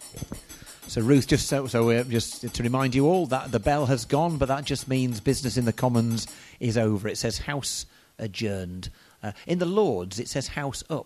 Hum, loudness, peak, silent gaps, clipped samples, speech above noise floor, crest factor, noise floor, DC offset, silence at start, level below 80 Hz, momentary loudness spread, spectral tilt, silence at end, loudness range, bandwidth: none; -26 LUFS; -8 dBFS; none; under 0.1%; 20 dB; 18 dB; -45 dBFS; under 0.1%; 0 s; -46 dBFS; 16 LU; -5.5 dB/octave; 0 s; 5 LU; 14 kHz